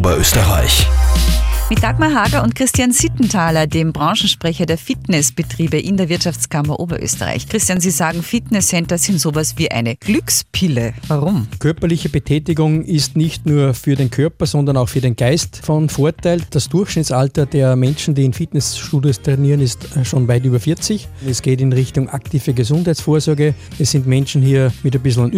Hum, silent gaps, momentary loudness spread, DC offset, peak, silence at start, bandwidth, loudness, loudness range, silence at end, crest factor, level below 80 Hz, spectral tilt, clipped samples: none; none; 5 LU; under 0.1%; 0 dBFS; 0 s; 16 kHz; -15 LUFS; 2 LU; 0 s; 14 dB; -26 dBFS; -5 dB/octave; under 0.1%